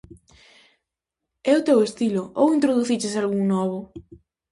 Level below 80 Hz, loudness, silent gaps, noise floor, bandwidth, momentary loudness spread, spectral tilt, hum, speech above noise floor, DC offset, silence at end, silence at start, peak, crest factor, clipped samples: -60 dBFS; -21 LUFS; none; -84 dBFS; 11.5 kHz; 10 LU; -6 dB/octave; none; 63 dB; under 0.1%; 0.5 s; 1.45 s; -6 dBFS; 16 dB; under 0.1%